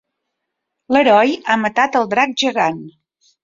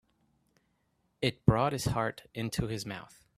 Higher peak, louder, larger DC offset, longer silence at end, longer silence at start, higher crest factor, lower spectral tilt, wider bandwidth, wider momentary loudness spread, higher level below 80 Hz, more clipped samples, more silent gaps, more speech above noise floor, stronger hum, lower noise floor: first, 0 dBFS vs -8 dBFS; first, -15 LUFS vs -32 LUFS; neither; first, 0.55 s vs 0.3 s; second, 0.9 s vs 1.2 s; second, 16 dB vs 26 dB; second, -4 dB/octave vs -5.5 dB/octave; second, 7.6 kHz vs 15 kHz; second, 7 LU vs 11 LU; second, -62 dBFS vs -50 dBFS; neither; neither; first, 62 dB vs 44 dB; neither; about the same, -77 dBFS vs -75 dBFS